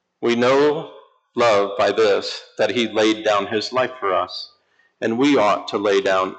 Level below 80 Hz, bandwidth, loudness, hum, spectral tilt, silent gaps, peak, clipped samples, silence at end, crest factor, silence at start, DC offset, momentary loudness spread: -68 dBFS; 8.8 kHz; -19 LUFS; none; -4.5 dB/octave; none; -8 dBFS; under 0.1%; 0 s; 12 dB; 0.2 s; under 0.1%; 12 LU